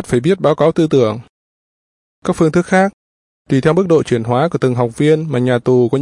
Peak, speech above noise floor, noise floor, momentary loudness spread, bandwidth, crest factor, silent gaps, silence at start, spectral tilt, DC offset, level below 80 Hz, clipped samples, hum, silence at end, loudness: 0 dBFS; over 77 dB; under -90 dBFS; 6 LU; 11.5 kHz; 14 dB; 1.29-2.22 s, 2.93-3.45 s; 0 s; -7 dB/octave; under 0.1%; -48 dBFS; under 0.1%; none; 0 s; -14 LUFS